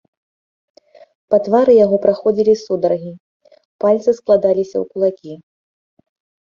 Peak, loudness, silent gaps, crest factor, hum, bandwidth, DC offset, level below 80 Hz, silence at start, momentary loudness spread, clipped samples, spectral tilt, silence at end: -2 dBFS; -15 LUFS; 3.20-3.40 s, 3.65-3.79 s; 16 dB; none; 7.2 kHz; under 0.1%; -60 dBFS; 1.3 s; 11 LU; under 0.1%; -7.5 dB/octave; 1.1 s